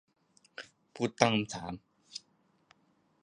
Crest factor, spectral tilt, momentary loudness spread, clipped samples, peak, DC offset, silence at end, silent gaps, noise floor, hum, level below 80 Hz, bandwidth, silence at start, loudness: 32 dB; -4.5 dB/octave; 21 LU; under 0.1%; -6 dBFS; under 0.1%; 1.05 s; none; -71 dBFS; none; -68 dBFS; 10.5 kHz; 0.6 s; -32 LUFS